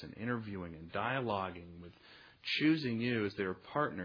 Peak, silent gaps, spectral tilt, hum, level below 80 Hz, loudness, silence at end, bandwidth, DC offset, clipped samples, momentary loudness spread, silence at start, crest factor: -18 dBFS; none; -4 dB/octave; none; -68 dBFS; -36 LUFS; 0 s; 5.4 kHz; under 0.1%; under 0.1%; 20 LU; 0 s; 18 dB